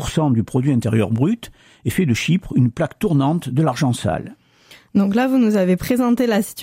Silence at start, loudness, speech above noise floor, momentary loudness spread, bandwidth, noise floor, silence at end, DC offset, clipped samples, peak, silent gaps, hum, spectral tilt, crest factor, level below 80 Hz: 0 s; -19 LUFS; 31 dB; 6 LU; 16 kHz; -49 dBFS; 0 s; under 0.1%; under 0.1%; -6 dBFS; none; none; -6.5 dB/octave; 12 dB; -44 dBFS